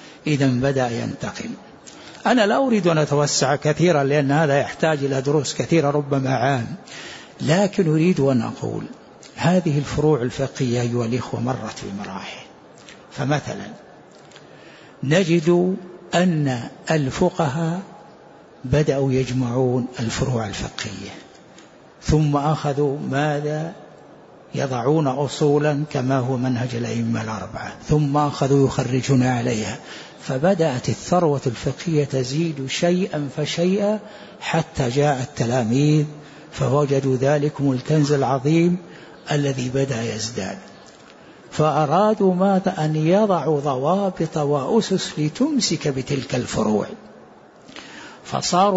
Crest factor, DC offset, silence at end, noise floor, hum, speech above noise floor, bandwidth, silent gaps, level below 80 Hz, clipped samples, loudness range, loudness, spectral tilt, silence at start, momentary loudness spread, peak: 16 dB; under 0.1%; 0 s; -46 dBFS; none; 26 dB; 8 kHz; none; -48 dBFS; under 0.1%; 5 LU; -21 LUFS; -6 dB/octave; 0 s; 14 LU; -4 dBFS